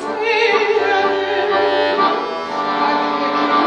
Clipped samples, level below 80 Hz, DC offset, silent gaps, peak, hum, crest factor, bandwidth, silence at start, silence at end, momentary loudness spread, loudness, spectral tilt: under 0.1%; -62 dBFS; under 0.1%; none; -2 dBFS; none; 14 dB; 9 kHz; 0 s; 0 s; 5 LU; -16 LUFS; -4 dB/octave